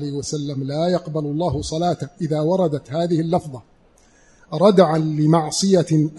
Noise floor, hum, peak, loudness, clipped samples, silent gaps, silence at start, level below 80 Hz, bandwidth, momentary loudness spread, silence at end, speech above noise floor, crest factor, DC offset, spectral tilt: -54 dBFS; none; -2 dBFS; -19 LUFS; under 0.1%; none; 0 s; -48 dBFS; 11.5 kHz; 10 LU; 0 s; 35 dB; 18 dB; under 0.1%; -6.5 dB/octave